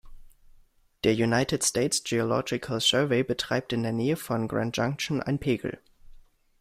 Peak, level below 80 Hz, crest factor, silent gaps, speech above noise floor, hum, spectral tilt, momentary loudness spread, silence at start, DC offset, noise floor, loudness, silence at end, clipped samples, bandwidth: -8 dBFS; -54 dBFS; 20 dB; none; 32 dB; none; -4 dB/octave; 6 LU; 0.05 s; under 0.1%; -59 dBFS; -27 LUFS; 0.45 s; under 0.1%; 16 kHz